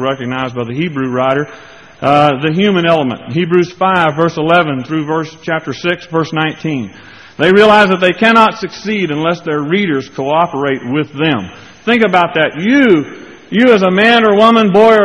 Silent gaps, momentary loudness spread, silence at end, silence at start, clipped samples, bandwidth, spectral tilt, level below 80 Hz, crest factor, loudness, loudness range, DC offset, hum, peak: none; 11 LU; 0 s; 0 s; 0.2%; 10.5 kHz; -6.5 dB/octave; -50 dBFS; 12 dB; -12 LUFS; 4 LU; 0.1%; none; 0 dBFS